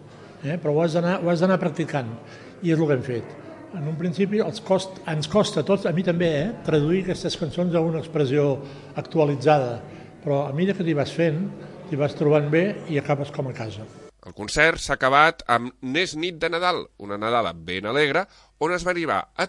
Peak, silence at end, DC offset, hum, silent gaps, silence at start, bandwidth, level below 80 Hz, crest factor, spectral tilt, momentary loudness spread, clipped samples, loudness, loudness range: -2 dBFS; 0 s; under 0.1%; none; none; 0 s; 11.5 kHz; -52 dBFS; 22 dB; -6 dB/octave; 14 LU; under 0.1%; -23 LUFS; 3 LU